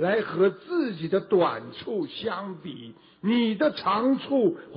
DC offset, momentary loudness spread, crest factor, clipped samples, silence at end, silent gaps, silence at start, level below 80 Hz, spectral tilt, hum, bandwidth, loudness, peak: under 0.1%; 12 LU; 14 dB; under 0.1%; 0 s; none; 0 s; -68 dBFS; -10.5 dB/octave; none; 5.4 kHz; -26 LUFS; -12 dBFS